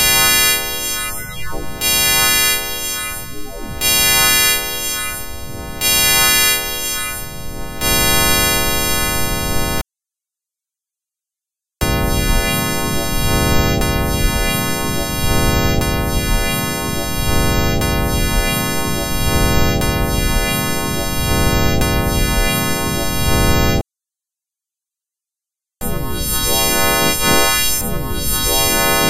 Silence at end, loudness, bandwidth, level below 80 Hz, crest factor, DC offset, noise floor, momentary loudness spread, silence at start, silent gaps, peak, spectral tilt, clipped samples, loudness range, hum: 0 s; -15 LUFS; 14.5 kHz; -24 dBFS; 16 dB; under 0.1%; -87 dBFS; 12 LU; 0 s; none; 0 dBFS; -2.5 dB/octave; under 0.1%; 7 LU; none